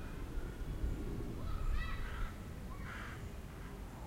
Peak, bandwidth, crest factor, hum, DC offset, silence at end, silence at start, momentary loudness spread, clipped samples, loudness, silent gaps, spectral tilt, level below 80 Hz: -26 dBFS; 16 kHz; 16 dB; none; under 0.1%; 0 s; 0 s; 7 LU; under 0.1%; -45 LUFS; none; -6 dB/octave; -42 dBFS